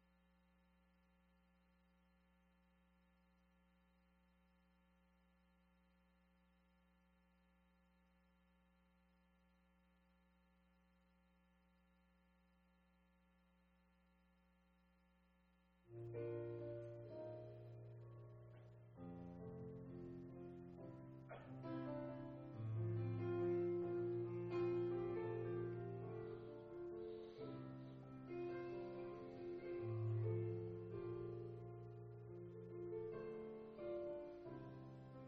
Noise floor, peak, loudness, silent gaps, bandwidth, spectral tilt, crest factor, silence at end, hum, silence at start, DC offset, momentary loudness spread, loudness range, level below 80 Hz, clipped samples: -77 dBFS; -34 dBFS; -50 LUFS; none; 5.2 kHz; -9 dB/octave; 18 dB; 0 s; none; 15.85 s; under 0.1%; 14 LU; 12 LU; -76 dBFS; under 0.1%